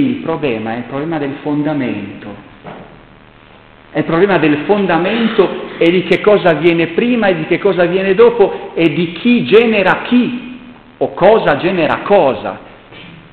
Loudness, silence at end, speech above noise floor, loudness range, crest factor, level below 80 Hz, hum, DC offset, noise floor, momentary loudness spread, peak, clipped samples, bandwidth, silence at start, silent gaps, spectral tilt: -13 LUFS; 0.15 s; 29 dB; 8 LU; 14 dB; -48 dBFS; none; 0.2%; -41 dBFS; 15 LU; 0 dBFS; under 0.1%; 4.7 kHz; 0 s; none; -8.5 dB/octave